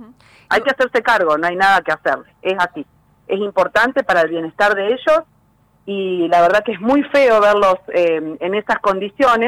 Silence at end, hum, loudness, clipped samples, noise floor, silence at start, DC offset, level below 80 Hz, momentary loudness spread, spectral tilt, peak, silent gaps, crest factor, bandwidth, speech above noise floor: 0 s; none; -16 LUFS; under 0.1%; -56 dBFS; 0 s; under 0.1%; -52 dBFS; 9 LU; -4.5 dB/octave; -6 dBFS; none; 10 dB; 16 kHz; 40 dB